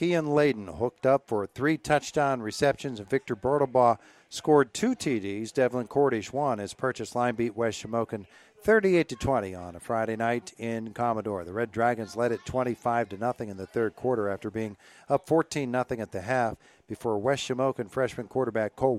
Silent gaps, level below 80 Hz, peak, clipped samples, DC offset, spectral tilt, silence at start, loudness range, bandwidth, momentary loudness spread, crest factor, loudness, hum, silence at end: none; -58 dBFS; -8 dBFS; under 0.1%; under 0.1%; -5.5 dB/octave; 0 s; 4 LU; 14 kHz; 10 LU; 18 dB; -28 LUFS; none; 0 s